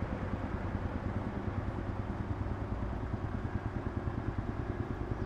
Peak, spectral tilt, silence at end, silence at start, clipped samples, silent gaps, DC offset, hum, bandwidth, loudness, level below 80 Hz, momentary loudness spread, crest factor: -20 dBFS; -9 dB/octave; 0 s; 0 s; under 0.1%; none; under 0.1%; none; 7.8 kHz; -38 LUFS; -42 dBFS; 1 LU; 16 dB